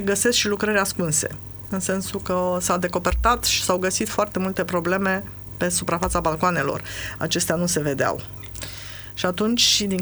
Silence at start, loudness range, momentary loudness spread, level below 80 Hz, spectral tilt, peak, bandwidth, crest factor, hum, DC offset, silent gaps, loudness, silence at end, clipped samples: 0 s; 2 LU; 12 LU; -38 dBFS; -3 dB/octave; -4 dBFS; over 20 kHz; 18 dB; none; under 0.1%; none; -22 LUFS; 0 s; under 0.1%